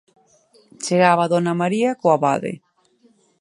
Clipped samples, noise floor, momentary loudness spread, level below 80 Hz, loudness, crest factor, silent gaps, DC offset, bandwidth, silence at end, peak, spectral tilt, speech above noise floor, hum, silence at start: under 0.1%; -58 dBFS; 15 LU; -68 dBFS; -18 LUFS; 20 dB; none; under 0.1%; 11.5 kHz; 0.85 s; 0 dBFS; -5.5 dB/octave; 40 dB; none; 0.8 s